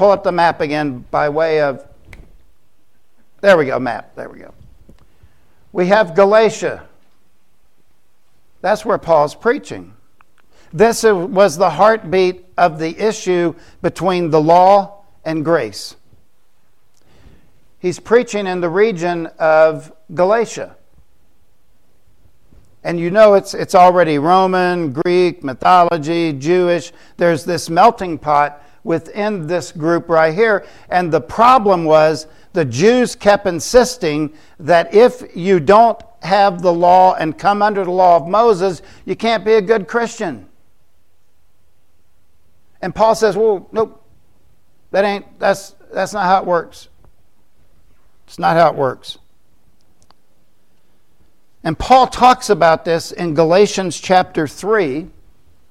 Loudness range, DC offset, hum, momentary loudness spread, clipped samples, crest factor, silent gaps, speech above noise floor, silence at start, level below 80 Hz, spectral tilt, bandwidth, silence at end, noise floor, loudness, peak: 7 LU; 0.7%; none; 13 LU; under 0.1%; 16 dB; none; 49 dB; 0 s; -46 dBFS; -5 dB/octave; 14 kHz; 0.65 s; -62 dBFS; -14 LUFS; 0 dBFS